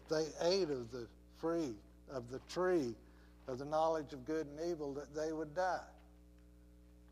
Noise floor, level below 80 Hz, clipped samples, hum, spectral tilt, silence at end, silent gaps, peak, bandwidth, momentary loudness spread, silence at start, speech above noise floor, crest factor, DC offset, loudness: -62 dBFS; -62 dBFS; under 0.1%; 60 Hz at -60 dBFS; -5 dB/octave; 0 s; none; -22 dBFS; 14.5 kHz; 14 LU; 0 s; 23 dB; 18 dB; under 0.1%; -40 LUFS